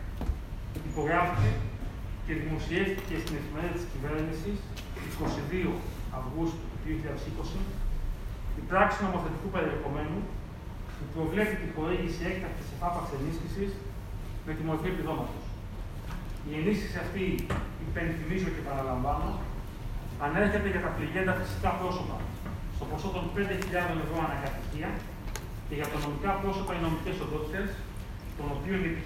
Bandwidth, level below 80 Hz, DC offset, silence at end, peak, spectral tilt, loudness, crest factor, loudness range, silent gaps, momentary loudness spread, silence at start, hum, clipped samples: 16 kHz; -38 dBFS; under 0.1%; 0 s; -8 dBFS; -6.5 dB/octave; -33 LUFS; 22 dB; 4 LU; none; 11 LU; 0 s; none; under 0.1%